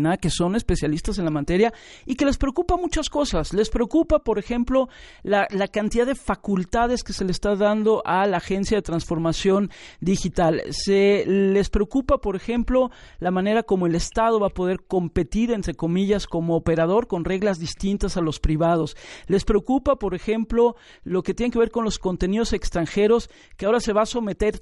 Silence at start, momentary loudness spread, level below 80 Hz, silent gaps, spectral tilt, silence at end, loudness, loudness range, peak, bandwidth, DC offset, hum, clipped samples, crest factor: 0 s; 6 LU; -34 dBFS; none; -6 dB/octave; 0 s; -22 LUFS; 2 LU; -6 dBFS; 11.5 kHz; under 0.1%; none; under 0.1%; 16 dB